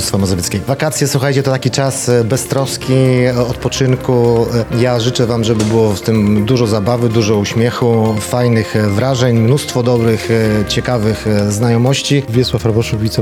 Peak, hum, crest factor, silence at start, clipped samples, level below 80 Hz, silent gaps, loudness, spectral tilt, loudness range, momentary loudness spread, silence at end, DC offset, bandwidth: 0 dBFS; none; 12 dB; 0 s; under 0.1%; -36 dBFS; none; -13 LUFS; -5.5 dB/octave; 1 LU; 3 LU; 0 s; under 0.1%; 16 kHz